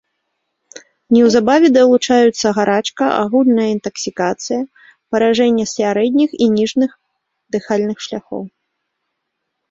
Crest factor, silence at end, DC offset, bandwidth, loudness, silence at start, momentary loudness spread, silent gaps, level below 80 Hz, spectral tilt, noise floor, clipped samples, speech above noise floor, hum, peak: 14 dB; 1.2 s; under 0.1%; 7.8 kHz; -15 LUFS; 0.75 s; 13 LU; none; -58 dBFS; -4.5 dB/octave; -74 dBFS; under 0.1%; 60 dB; none; -2 dBFS